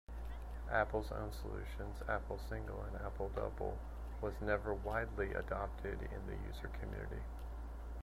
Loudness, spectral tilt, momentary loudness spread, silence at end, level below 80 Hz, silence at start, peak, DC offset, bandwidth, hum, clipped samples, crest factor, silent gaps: -43 LUFS; -7 dB/octave; 10 LU; 0 s; -46 dBFS; 0.1 s; -20 dBFS; under 0.1%; 15 kHz; none; under 0.1%; 22 dB; none